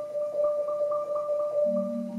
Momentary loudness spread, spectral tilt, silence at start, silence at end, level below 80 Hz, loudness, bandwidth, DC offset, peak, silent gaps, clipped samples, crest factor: 3 LU; -8.5 dB/octave; 0 s; 0 s; -78 dBFS; -28 LUFS; 7.2 kHz; under 0.1%; -18 dBFS; none; under 0.1%; 10 dB